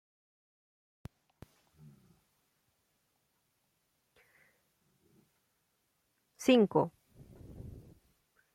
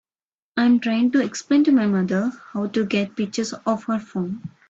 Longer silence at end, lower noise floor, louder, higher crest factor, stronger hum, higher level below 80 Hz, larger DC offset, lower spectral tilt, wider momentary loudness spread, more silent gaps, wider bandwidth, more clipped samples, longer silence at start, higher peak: first, 0.85 s vs 0.2 s; second, -79 dBFS vs under -90 dBFS; second, -29 LUFS vs -22 LUFS; first, 26 dB vs 14 dB; neither; about the same, -68 dBFS vs -64 dBFS; neither; about the same, -6 dB/octave vs -5.5 dB/octave; first, 29 LU vs 10 LU; neither; first, 15.5 kHz vs 8 kHz; neither; first, 6.4 s vs 0.55 s; second, -14 dBFS vs -8 dBFS